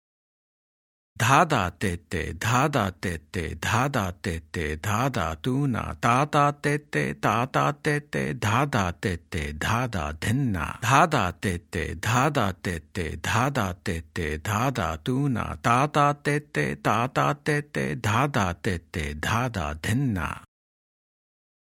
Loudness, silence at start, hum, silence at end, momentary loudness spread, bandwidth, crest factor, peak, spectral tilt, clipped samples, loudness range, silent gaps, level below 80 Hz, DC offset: -26 LUFS; 1.2 s; none; 1.2 s; 9 LU; 16.5 kHz; 22 dB; -4 dBFS; -5.5 dB/octave; under 0.1%; 3 LU; none; -46 dBFS; under 0.1%